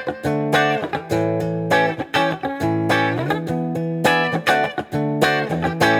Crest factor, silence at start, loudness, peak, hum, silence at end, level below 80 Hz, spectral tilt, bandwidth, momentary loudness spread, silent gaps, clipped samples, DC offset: 18 dB; 0 s; -20 LUFS; -2 dBFS; none; 0 s; -54 dBFS; -5.5 dB/octave; over 20 kHz; 5 LU; none; under 0.1%; under 0.1%